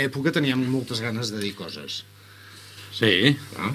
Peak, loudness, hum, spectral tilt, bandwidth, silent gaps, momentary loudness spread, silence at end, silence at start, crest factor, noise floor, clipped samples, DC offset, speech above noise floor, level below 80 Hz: -2 dBFS; -24 LUFS; 50 Hz at -50 dBFS; -5 dB/octave; 16 kHz; none; 22 LU; 0 s; 0 s; 22 dB; -46 dBFS; under 0.1%; under 0.1%; 22 dB; -60 dBFS